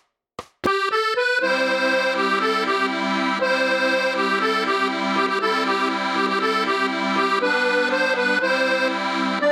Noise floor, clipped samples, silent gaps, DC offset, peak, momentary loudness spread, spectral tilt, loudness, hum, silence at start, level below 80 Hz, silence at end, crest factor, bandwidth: -41 dBFS; under 0.1%; none; under 0.1%; -6 dBFS; 2 LU; -3.5 dB/octave; -20 LUFS; none; 0.4 s; -66 dBFS; 0 s; 14 dB; 13.5 kHz